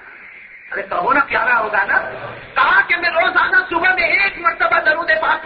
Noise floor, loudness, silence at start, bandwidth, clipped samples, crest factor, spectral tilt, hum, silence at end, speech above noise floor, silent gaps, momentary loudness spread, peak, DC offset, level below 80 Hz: -38 dBFS; -15 LUFS; 0 s; 5.4 kHz; under 0.1%; 14 dB; -6 dB/octave; none; 0 s; 22 dB; none; 10 LU; -2 dBFS; under 0.1%; -50 dBFS